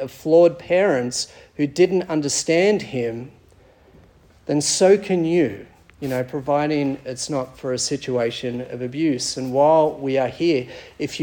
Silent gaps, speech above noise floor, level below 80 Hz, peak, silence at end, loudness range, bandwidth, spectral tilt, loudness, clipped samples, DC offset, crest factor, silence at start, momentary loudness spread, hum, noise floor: none; 32 dB; -56 dBFS; -4 dBFS; 0 s; 4 LU; 18 kHz; -4.5 dB/octave; -20 LUFS; under 0.1%; under 0.1%; 18 dB; 0 s; 13 LU; none; -52 dBFS